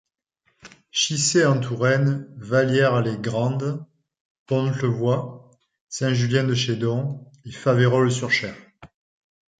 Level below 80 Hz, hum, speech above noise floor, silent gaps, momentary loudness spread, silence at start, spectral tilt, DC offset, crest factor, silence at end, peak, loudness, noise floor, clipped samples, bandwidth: -60 dBFS; none; 49 dB; 4.20-4.46 s, 5.81-5.87 s; 12 LU; 0.65 s; -5 dB/octave; under 0.1%; 18 dB; 0.75 s; -4 dBFS; -22 LUFS; -70 dBFS; under 0.1%; 9.4 kHz